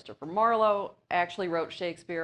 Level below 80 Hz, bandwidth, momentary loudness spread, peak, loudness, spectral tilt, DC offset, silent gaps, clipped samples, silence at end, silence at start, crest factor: -70 dBFS; 10.5 kHz; 10 LU; -12 dBFS; -29 LUFS; -5.5 dB/octave; under 0.1%; none; under 0.1%; 0 s; 0.05 s; 16 dB